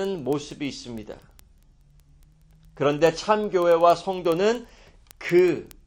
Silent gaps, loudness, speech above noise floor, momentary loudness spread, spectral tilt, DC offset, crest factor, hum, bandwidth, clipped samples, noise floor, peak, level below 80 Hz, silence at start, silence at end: none; -23 LUFS; 33 dB; 17 LU; -5.5 dB/octave; under 0.1%; 18 dB; none; 17 kHz; under 0.1%; -55 dBFS; -6 dBFS; -54 dBFS; 0 s; 0.2 s